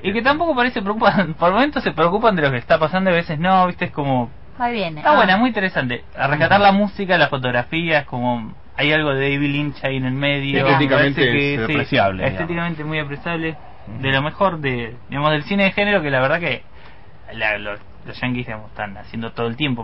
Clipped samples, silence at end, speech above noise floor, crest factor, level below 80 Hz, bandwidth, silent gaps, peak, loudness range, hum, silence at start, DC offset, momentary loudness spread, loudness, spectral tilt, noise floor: under 0.1%; 0 s; 25 dB; 16 dB; -44 dBFS; 5.8 kHz; none; -4 dBFS; 5 LU; none; 0 s; 1%; 12 LU; -18 LUFS; -8.5 dB/octave; -44 dBFS